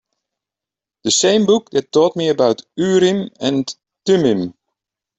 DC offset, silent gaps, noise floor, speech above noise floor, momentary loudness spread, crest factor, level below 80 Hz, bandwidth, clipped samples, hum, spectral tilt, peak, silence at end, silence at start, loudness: under 0.1%; none; -88 dBFS; 72 dB; 10 LU; 16 dB; -60 dBFS; 8.4 kHz; under 0.1%; none; -4 dB/octave; -2 dBFS; 0.65 s; 1.05 s; -16 LUFS